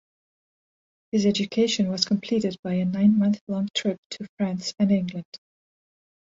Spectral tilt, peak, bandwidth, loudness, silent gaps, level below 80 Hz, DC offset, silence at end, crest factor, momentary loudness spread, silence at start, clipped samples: -5.5 dB/octave; -6 dBFS; 7.8 kHz; -24 LUFS; 2.59-2.63 s, 3.41-3.47 s, 3.70-3.74 s, 3.98-4.10 s, 4.29-4.37 s, 5.25-5.32 s; -64 dBFS; under 0.1%; 0.95 s; 20 dB; 11 LU; 1.15 s; under 0.1%